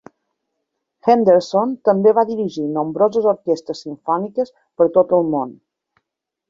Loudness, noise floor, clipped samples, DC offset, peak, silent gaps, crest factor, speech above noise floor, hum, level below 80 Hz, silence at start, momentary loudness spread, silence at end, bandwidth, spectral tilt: -17 LUFS; -80 dBFS; under 0.1%; under 0.1%; -2 dBFS; none; 16 dB; 63 dB; none; -64 dBFS; 1.05 s; 10 LU; 0.95 s; 7.6 kHz; -7.5 dB/octave